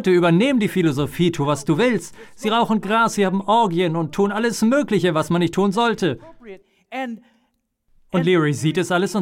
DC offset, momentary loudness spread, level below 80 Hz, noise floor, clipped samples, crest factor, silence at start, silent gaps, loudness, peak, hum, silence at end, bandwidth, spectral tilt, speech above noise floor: under 0.1%; 11 LU; -54 dBFS; -68 dBFS; under 0.1%; 12 dB; 0 s; none; -19 LUFS; -6 dBFS; none; 0 s; 16.5 kHz; -6 dB/octave; 49 dB